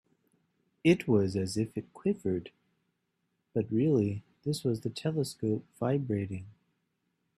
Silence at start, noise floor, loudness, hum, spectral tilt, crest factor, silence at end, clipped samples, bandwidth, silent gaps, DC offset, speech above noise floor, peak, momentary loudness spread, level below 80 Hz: 0.85 s; -80 dBFS; -31 LUFS; none; -7 dB/octave; 22 dB; 0.9 s; under 0.1%; 13.5 kHz; none; under 0.1%; 50 dB; -10 dBFS; 9 LU; -68 dBFS